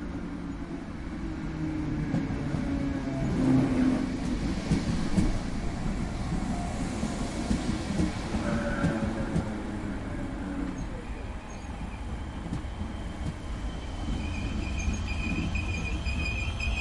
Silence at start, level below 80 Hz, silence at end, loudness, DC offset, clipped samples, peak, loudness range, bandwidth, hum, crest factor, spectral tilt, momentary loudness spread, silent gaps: 0 s; -36 dBFS; 0 s; -32 LUFS; under 0.1%; under 0.1%; -12 dBFS; 8 LU; 11.5 kHz; none; 18 dB; -6.5 dB/octave; 9 LU; none